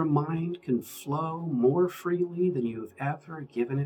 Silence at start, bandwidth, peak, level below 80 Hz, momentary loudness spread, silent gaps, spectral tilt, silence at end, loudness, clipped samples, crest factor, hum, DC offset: 0 s; 19.5 kHz; -12 dBFS; -72 dBFS; 9 LU; none; -8 dB/octave; 0 s; -29 LUFS; under 0.1%; 16 dB; none; under 0.1%